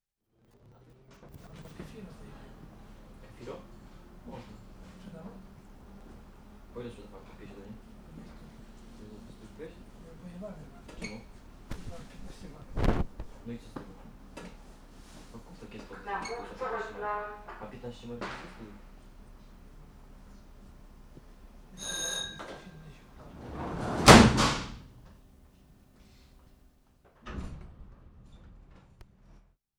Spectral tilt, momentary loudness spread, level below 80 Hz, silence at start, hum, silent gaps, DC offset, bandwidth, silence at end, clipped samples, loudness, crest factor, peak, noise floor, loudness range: -4.5 dB/octave; 21 LU; -44 dBFS; 1.2 s; none; none; under 0.1%; over 20 kHz; 1.2 s; under 0.1%; -28 LUFS; 32 dB; -2 dBFS; -70 dBFS; 26 LU